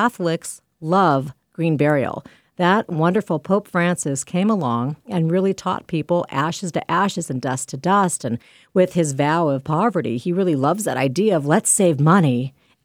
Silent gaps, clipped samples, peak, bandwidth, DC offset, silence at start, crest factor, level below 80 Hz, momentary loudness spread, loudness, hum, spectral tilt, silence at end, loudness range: none; under 0.1%; -2 dBFS; 16 kHz; under 0.1%; 0 s; 18 dB; -62 dBFS; 9 LU; -20 LUFS; none; -5.5 dB/octave; 0.35 s; 3 LU